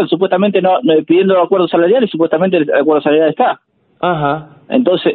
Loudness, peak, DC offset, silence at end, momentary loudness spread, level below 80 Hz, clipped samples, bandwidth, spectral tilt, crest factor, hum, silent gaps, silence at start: -13 LUFS; 0 dBFS; under 0.1%; 0 s; 6 LU; -56 dBFS; under 0.1%; 4.4 kHz; -11.5 dB/octave; 12 dB; none; none; 0 s